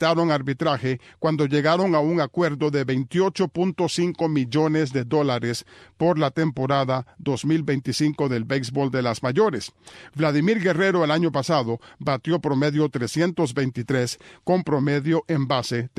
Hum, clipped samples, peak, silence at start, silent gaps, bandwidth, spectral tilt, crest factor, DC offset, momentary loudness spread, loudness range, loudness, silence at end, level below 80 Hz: none; under 0.1%; -8 dBFS; 0 s; none; 13.5 kHz; -6 dB/octave; 16 dB; under 0.1%; 6 LU; 2 LU; -23 LUFS; 0.1 s; -60 dBFS